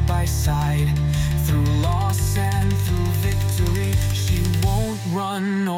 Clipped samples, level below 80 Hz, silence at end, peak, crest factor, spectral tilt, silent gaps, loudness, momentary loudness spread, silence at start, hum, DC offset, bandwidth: under 0.1%; -28 dBFS; 0 s; -8 dBFS; 10 dB; -6 dB/octave; none; -21 LUFS; 3 LU; 0 s; none; under 0.1%; 16.5 kHz